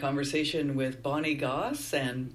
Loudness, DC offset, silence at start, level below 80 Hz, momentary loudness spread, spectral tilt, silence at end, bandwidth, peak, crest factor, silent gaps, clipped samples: -30 LUFS; under 0.1%; 0 s; -58 dBFS; 2 LU; -5 dB/octave; 0 s; 15 kHz; -16 dBFS; 14 dB; none; under 0.1%